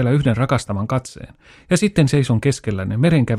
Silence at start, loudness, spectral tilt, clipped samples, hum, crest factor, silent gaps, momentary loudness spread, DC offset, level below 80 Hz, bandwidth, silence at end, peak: 0 s; -18 LUFS; -6.5 dB/octave; under 0.1%; none; 16 dB; none; 8 LU; under 0.1%; -42 dBFS; 12.5 kHz; 0 s; -2 dBFS